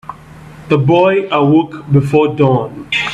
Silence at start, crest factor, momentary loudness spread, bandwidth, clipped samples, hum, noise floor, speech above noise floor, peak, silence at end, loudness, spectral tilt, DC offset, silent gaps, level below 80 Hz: 0.1 s; 12 dB; 7 LU; 9 kHz; under 0.1%; none; -35 dBFS; 23 dB; 0 dBFS; 0 s; -12 LUFS; -7.5 dB/octave; under 0.1%; none; -46 dBFS